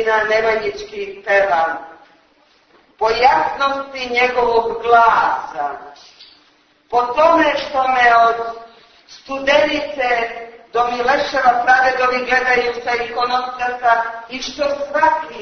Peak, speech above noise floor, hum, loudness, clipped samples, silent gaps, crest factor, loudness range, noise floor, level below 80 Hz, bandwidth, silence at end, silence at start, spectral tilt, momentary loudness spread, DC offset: 0 dBFS; 38 dB; none; -16 LUFS; under 0.1%; none; 16 dB; 3 LU; -55 dBFS; -50 dBFS; 6.6 kHz; 0 s; 0 s; -3 dB/octave; 13 LU; under 0.1%